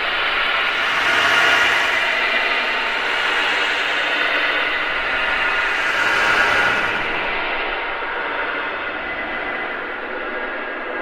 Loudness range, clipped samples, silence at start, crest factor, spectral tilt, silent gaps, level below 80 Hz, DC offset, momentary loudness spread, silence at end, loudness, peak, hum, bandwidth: 7 LU; under 0.1%; 0 s; 18 dB; -1.5 dB/octave; none; -44 dBFS; under 0.1%; 10 LU; 0 s; -18 LUFS; -2 dBFS; none; 16 kHz